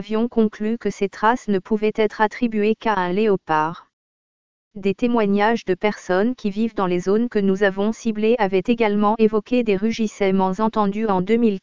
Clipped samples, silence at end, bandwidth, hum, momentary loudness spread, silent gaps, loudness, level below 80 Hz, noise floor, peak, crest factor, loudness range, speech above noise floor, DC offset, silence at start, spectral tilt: under 0.1%; 0 s; 7.6 kHz; none; 5 LU; 3.93-4.71 s; -20 LUFS; -52 dBFS; under -90 dBFS; -2 dBFS; 18 dB; 3 LU; over 70 dB; 2%; 0 s; -6.5 dB/octave